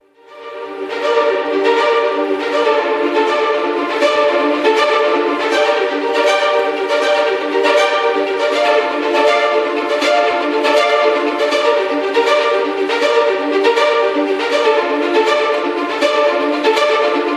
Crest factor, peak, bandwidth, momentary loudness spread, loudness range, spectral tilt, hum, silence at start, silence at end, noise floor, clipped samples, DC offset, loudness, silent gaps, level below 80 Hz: 14 dB; 0 dBFS; 12.5 kHz; 4 LU; 1 LU; -2 dB/octave; none; 0.3 s; 0 s; -35 dBFS; under 0.1%; under 0.1%; -14 LUFS; none; -66 dBFS